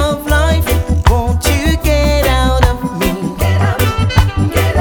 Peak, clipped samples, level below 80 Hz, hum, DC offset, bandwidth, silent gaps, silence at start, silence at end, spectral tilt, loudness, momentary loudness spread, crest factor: 0 dBFS; under 0.1%; -16 dBFS; none; under 0.1%; over 20 kHz; none; 0 s; 0 s; -5.5 dB/octave; -13 LUFS; 4 LU; 12 dB